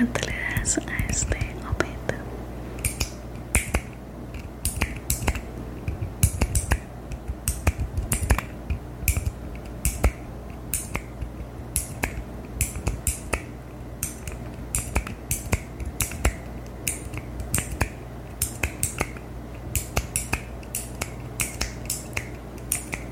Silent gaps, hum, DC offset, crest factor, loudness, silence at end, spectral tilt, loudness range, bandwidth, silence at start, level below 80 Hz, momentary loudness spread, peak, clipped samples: none; none; under 0.1%; 28 dB; -29 LUFS; 0 s; -4 dB/octave; 3 LU; 17 kHz; 0 s; -34 dBFS; 12 LU; -2 dBFS; under 0.1%